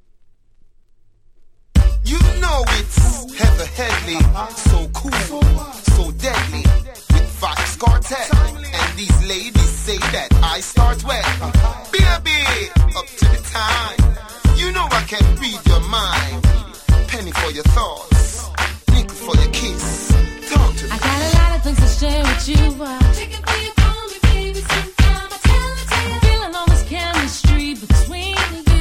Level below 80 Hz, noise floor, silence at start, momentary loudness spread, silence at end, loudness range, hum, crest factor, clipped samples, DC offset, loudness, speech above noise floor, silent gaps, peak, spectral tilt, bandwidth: -18 dBFS; -49 dBFS; 1.75 s; 4 LU; 0 s; 1 LU; none; 14 dB; under 0.1%; under 0.1%; -17 LUFS; 34 dB; none; 0 dBFS; -4.5 dB/octave; 15.5 kHz